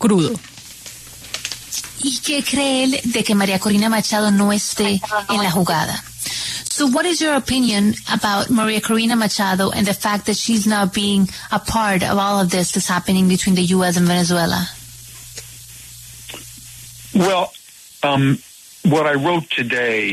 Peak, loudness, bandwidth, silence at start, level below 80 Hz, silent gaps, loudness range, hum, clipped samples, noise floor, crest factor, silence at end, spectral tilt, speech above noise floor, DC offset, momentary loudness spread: -4 dBFS; -17 LUFS; 13.5 kHz; 0 s; -46 dBFS; none; 5 LU; none; under 0.1%; -38 dBFS; 14 dB; 0 s; -4 dB/octave; 21 dB; under 0.1%; 17 LU